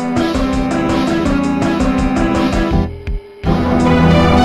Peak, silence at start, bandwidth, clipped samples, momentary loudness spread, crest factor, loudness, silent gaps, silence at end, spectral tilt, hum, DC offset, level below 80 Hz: -2 dBFS; 0 s; 12.5 kHz; under 0.1%; 8 LU; 12 dB; -15 LUFS; none; 0 s; -7 dB/octave; none; under 0.1%; -24 dBFS